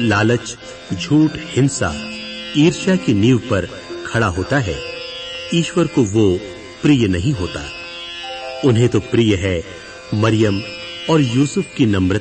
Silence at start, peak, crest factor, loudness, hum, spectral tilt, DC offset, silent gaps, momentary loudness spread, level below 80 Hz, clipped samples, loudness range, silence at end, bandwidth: 0 s; -2 dBFS; 14 dB; -18 LUFS; none; -6 dB/octave; under 0.1%; none; 12 LU; -42 dBFS; under 0.1%; 2 LU; 0 s; 8.8 kHz